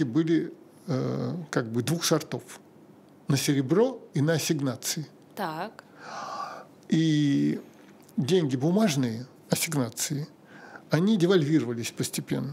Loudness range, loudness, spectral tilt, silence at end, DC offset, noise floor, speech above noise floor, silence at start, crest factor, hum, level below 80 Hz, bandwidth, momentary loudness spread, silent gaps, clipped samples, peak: 3 LU; -27 LUFS; -5.5 dB/octave; 0 s; under 0.1%; -53 dBFS; 27 dB; 0 s; 18 dB; none; -74 dBFS; 16 kHz; 16 LU; none; under 0.1%; -8 dBFS